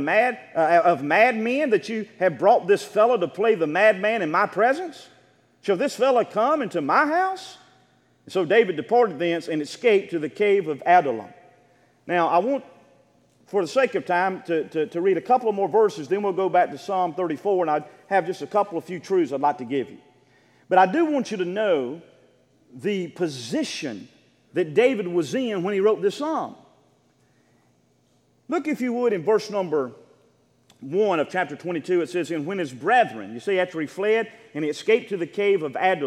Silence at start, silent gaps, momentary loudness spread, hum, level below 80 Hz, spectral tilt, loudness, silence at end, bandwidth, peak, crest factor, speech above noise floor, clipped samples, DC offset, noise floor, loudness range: 0 s; none; 10 LU; none; -80 dBFS; -5.5 dB/octave; -23 LUFS; 0 s; 13 kHz; -4 dBFS; 20 dB; 41 dB; under 0.1%; under 0.1%; -63 dBFS; 6 LU